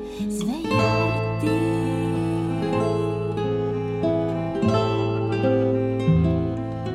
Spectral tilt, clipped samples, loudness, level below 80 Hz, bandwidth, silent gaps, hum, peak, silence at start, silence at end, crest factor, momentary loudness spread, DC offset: -7.5 dB/octave; under 0.1%; -23 LUFS; -42 dBFS; 13 kHz; none; none; -8 dBFS; 0 s; 0 s; 16 dB; 5 LU; under 0.1%